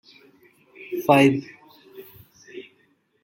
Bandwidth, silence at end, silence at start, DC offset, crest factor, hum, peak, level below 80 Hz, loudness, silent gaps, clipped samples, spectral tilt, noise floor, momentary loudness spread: 17 kHz; 0.6 s; 0.8 s; under 0.1%; 22 dB; none; -4 dBFS; -68 dBFS; -20 LUFS; none; under 0.1%; -6.5 dB/octave; -64 dBFS; 28 LU